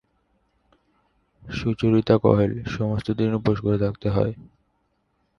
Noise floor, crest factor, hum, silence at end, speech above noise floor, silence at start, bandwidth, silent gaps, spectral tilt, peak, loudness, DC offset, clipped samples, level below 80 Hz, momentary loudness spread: -70 dBFS; 22 dB; none; 0.95 s; 48 dB; 1.45 s; 6.8 kHz; none; -8.5 dB/octave; -2 dBFS; -23 LUFS; under 0.1%; under 0.1%; -46 dBFS; 9 LU